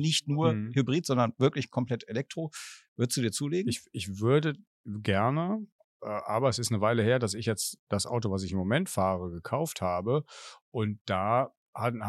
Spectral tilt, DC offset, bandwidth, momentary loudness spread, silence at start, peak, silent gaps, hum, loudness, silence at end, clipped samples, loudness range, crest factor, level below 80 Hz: -5 dB/octave; under 0.1%; 13 kHz; 11 LU; 0 s; -12 dBFS; 2.88-2.96 s, 4.67-4.84 s, 5.72-6.00 s, 7.79-7.87 s, 10.61-10.72 s, 11.01-11.05 s, 11.57-11.73 s; none; -30 LUFS; 0 s; under 0.1%; 2 LU; 18 dB; -64 dBFS